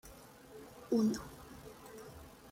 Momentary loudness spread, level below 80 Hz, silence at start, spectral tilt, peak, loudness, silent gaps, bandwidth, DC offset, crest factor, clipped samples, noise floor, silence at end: 22 LU; -64 dBFS; 0.05 s; -6 dB/octave; -22 dBFS; -35 LUFS; none; 16.5 kHz; under 0.1%; 18 dB; under 0.1%; -56 dBFS; 0 s